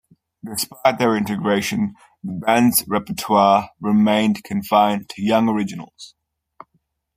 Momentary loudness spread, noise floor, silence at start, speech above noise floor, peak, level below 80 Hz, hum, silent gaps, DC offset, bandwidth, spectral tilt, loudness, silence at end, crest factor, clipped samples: 13 LU; -68 dBFS; 0.45 s; 49 dB; -2 dBFS; -58 dBFS; none; none; under 0.1%; 15.5 kHz; -4.5 dB/octave; -19 LUFS; 1.1 s; 18 dB; under 0.1%